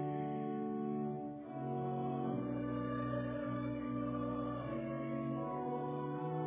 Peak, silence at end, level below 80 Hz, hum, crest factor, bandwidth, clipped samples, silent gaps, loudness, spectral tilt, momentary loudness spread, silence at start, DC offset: -28 dBFS; 0 s; -64 dBFS; none; 12 dB; 3.8 kHz; under 0.1%; none; -40 LUFS; -8 dB/octave; 2 LU; 0 s; under 0.1%